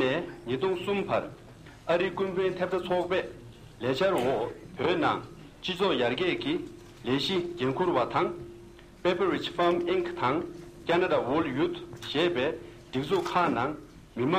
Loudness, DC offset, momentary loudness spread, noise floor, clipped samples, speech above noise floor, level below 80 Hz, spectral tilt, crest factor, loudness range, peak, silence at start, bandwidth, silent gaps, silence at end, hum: -29 LUFS; under 0.1%; 15 LU; -49 dBFS; under 0.1%; 21 dB; -58 dBFS; -6 dB/octave; 18 dB; 2 LU; -12 dBFS; 0 s; 15 kHz; none; 0 s; none